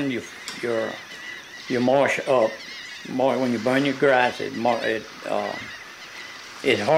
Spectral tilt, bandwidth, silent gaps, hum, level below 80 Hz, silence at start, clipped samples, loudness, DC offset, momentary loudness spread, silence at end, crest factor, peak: -4.5 dB/octave; 16 kHz; none; none; -66 dBFS; 0 s; under 0.1%; -23 LUFS; under 0.1%; 16 LU; 0 s; 18 dB; -4 dBFS